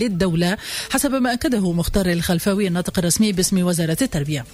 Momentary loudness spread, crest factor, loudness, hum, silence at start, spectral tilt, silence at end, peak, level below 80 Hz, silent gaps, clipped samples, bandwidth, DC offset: 4 LU; 14 dB; -20 LUFS; none; 0 s; -4.5 dB/octave; 0 s; -6 dBFS; -36 dBFS; none; under 0.1%; 16 kHz; under 0.1%